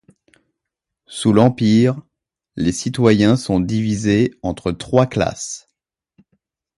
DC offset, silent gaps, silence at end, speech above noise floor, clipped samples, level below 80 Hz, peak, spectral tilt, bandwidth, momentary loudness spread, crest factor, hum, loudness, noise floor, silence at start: under 0.1%; none; 1.2 s; 65 dB; under 0.1%; -44 dBFS; 0 dBFS; -6 dB/octave; 11.5 kHz; 14 LU; 18 dB; none; -17 LUFS; -82 dBFS; 1.1 s